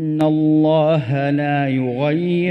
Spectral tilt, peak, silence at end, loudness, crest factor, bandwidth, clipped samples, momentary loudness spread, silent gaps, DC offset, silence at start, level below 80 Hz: -9 dB/octave; -4 dBFS; 0 s; -17 LUFS; 12 dB; 5.6 kHz; under 0.1%; 5 LU; none; under 0.1%; 0 s; -58 dBFS